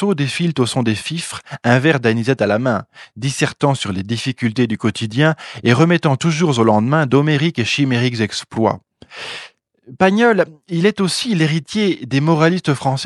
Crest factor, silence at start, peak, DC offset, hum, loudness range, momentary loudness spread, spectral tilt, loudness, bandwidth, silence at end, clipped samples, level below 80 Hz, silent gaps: 16 dB; 0 s; 0 dBFS; under 0.1%; none; 3 LU; 8 LU; -5.5 dB/octave; -17 LUFS; 12 kHz; 0 s; under 0.1%; -58 dBFS; none